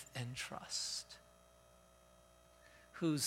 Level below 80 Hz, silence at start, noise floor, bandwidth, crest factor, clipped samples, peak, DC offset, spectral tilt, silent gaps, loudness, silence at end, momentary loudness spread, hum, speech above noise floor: -72 dBFS; 0 s; -66 dBFS; 16.5 kHz; 20 dB; under 0.1%; -26 dBFS; under 0.1%; -3.5 dB/octave; none; -43 LUFS; 0 s; 25 LU; 60 Hz at -70 dBFS; 25 dB